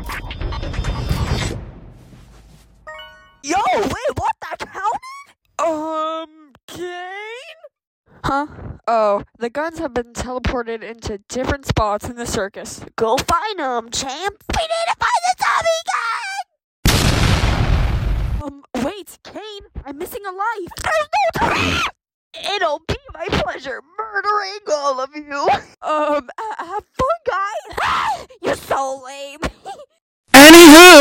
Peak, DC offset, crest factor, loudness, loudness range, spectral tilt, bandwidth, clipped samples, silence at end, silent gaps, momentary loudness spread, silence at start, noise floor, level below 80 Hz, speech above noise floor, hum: 0 dBFS; under 0.1%; 16 dB; -15 LUFS; 7 LU; -3.5 dB/octave; 16.5 kHz; 0.4%; 0 s; 6.63-6.68 s, 7.87-8.04 s, 16.64-16.83 s, 22.14-22.31 s, 30.01-30.24 s; 13 LU; 0 s; -46 dBFS; -30 dBFS; 32 dB; none